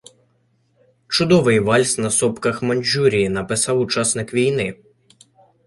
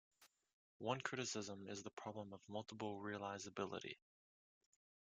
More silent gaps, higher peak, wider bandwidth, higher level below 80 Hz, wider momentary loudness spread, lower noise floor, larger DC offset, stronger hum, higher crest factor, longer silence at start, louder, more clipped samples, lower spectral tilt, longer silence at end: second, none vs 0.53-0.80 s, 1.93-1.97 s; first, -2 dBFS vs -26 dBFS; first, 11.5 kHz vs 10 kHz; first, -52 dBFS vs -88 dBFS; about the same, 6 LU vs 8 LU; second, -63 dBFS vs under -90 dBFS; neither; neither; second, 18 dB vs 24 dB; first, 1.1 s vs 0.2 s; first, -18 LUFS vs -48 LUFS; neither; about the same, -4 dB/octave vs -4 dB/octave; second, 0.9 s vs 1.15 s